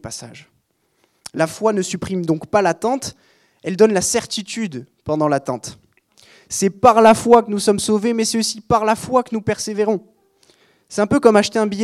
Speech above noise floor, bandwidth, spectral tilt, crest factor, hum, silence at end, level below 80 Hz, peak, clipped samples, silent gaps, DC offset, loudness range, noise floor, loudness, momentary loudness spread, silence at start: 48 dB; 14.5 kHz; -4.5 dB/octave; 18 dB; none; 0 s; -54 dBFS; 0 dBFS; under 0.1%; none; under 0.1%; 6 LU; -65 dBFS; -17 LUFS; 15 LU; 0.05 s